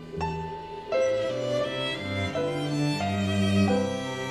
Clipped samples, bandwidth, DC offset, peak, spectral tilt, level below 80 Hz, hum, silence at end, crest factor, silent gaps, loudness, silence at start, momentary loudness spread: under 0.1%; 14 kHz; under 0.1%; -12 dBFS; -6 dB/octave; -54 dBFS; none; 0 s; 14 dB; none; -27 LUFS; 0 s; 8 LU